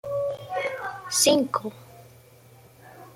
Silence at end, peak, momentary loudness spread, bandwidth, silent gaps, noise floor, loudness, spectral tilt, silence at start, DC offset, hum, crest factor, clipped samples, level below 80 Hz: 0.05 s; -6 dBFS; 13 LU; 16.5 kHz; none; -52 dBFS; -25 LUFS; -2 dB/octave; 0.05 s; under 0.1%; none; 22 dB; under 0.1%; -66 dBFS